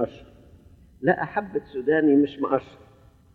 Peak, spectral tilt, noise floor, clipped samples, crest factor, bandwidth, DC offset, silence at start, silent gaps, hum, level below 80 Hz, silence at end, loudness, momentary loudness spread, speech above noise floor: -6 dBFS; -9 dB/octave; -51 dBFS; under 0.1%; 20 dB; 4.5 kHz; under 0.1%; 0 s; none; none; -56 dBFS; 0.65 s; -24 LUFS; 10 LU; 28 dB